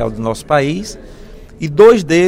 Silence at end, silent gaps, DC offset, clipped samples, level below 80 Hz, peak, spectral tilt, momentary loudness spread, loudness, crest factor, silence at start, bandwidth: 0 s; none; under 0.1%; 0.2%; -36 dBFS; 0 dBFS; -6 dB/octave; 17 LU; -12 LUFS; 14 dB; 0 s; 13 kHz